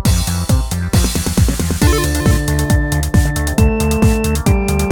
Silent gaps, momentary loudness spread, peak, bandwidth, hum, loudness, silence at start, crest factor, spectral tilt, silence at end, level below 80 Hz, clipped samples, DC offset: none; 3 LU; 0 dBFS; 19 kHz; none; -15 LUFS; 0 s; 12 dB; -5.5 dB/octave; 0 s; -18 dBFS; under 0.1%; under 0.1%